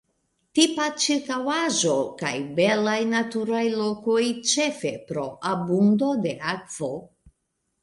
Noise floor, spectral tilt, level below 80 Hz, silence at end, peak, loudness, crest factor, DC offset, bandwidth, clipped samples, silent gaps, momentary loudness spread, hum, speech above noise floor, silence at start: -76 dBFS; -3.5 dB/octave; -66 dBFS; 0.75 s; -6 dBFS; -24 LUFS; 18 dB; under 0.1%; 11.5 kHz; under 0.1%; none; 10 LU; none; 53 dB; 0.55 s